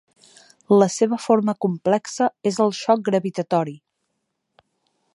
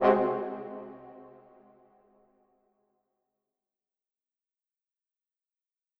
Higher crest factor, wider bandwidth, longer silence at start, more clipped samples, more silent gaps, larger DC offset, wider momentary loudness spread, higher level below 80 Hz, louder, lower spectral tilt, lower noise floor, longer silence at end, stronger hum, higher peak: second, 20 dB vs 28 dB; first, 11.5 kHz vs 5.8 kHz; first, 0.7 s vs 0 s; neither; neither; neither; second, 6 LU vs 26 LU; about the same, -72 dBFS vs -76 dBFS; first, -21 LUFS vs -31 LUFS; second, -5.5 dB/octave vs -8.5 dB/octave; second, -76 dBFS vs -90 dBFS; second, 1.35 s vs 4.7 s; neither; first, -2 dBFS vs -8 dBFS